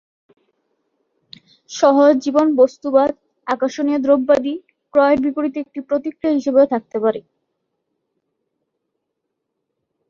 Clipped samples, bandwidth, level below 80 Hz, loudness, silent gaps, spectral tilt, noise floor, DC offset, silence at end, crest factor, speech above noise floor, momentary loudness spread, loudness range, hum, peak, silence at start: under 0.1%; 7.2 kHz; -60 dBFS; -17 LUFS; none; -5 dB/octave; -77 dBFS; under 0.1%; 2.9 s; 18 dB; 61 dB; 12 LU; 6 LU; none; -2 dBFS; 1.7 s